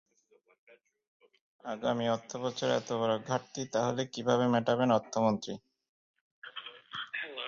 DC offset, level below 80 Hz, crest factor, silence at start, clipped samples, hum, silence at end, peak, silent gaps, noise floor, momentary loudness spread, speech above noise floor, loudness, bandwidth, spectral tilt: under 0.1%; -74 dBFS; 20 dB; 1.65 s; under 0.1%; none; 0 s; -14 dBFS; 5.89-6.14 s, 6.21-6.42 s; -68 dBFS; 16 LU; 37 dB; -32 LUFS; 7.6 kHz; -5 dB/octave